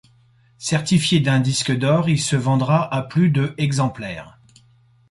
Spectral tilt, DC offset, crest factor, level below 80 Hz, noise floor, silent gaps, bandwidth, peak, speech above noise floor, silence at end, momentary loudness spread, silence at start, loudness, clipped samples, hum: -5.5 dB/octave; under 0.1%; 14 dB; -52 dBFS; -55 dBFS; none; 11.5 kHz; -6 dBFS; 37 dB; 0.8 s; 8 LU; 0.6 s; -19 LUFS; under 0.1%; none